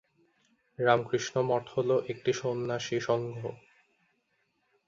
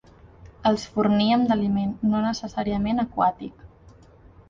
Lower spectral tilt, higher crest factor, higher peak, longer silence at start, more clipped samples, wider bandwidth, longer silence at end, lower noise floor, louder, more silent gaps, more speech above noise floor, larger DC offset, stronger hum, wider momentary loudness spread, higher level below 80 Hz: second, -5 dB/octave vs -6.5 dB/octave; first, 24 dB vs 16 dB; about the same, -8 dBFS vs -8 dBFS; first, 0.8 s vs 0.45 s; neither; about the same, 7.6 kHz vs 7.4 kHz; first, 1.35 s vs 0.85 s; first, -75 dBFS vs -51 dBFS; second, -30 LUFS vs -23 LUFS; neither; first, 46 dB vs 28 dB; neither; neither; about the same, 7 LU vs 7 LU; second, -72 dBFS vs -48 dBFS